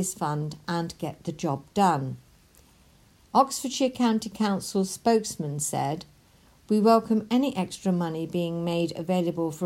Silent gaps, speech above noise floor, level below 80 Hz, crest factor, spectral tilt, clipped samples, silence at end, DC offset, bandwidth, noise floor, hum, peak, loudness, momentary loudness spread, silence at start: none; 32 dB; -62 dBFS; 20 dB; -5.5 dB/octave; under 0.1%; 0 s; under 0.1%; 16 kHz; -58 dBFS; none; -6 dBFS; -26 LUFS; 9 LU; 0 s